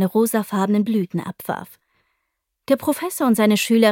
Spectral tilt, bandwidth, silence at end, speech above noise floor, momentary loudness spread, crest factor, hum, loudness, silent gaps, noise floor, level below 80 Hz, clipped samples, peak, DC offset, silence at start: -5 dB/octave; 17 kHz; 0 s; 57 dB; 12 LU; 18 dB; none; -20 LUFS; none; -76 dBFS; -66 dBFS; under 0.1%; -2 dBFS; under 0.1%; 0 s